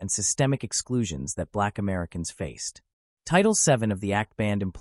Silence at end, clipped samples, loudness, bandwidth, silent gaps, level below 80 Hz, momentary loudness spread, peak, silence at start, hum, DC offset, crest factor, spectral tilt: 0 s; under 0.1%; -26 LUFS; 13.5 kHz; 2.93-3.17 s; -50 dBFS; 12 LU; -8 dBFS; 0 s; none; under 0.1%; 18 dB; -4 dB/octave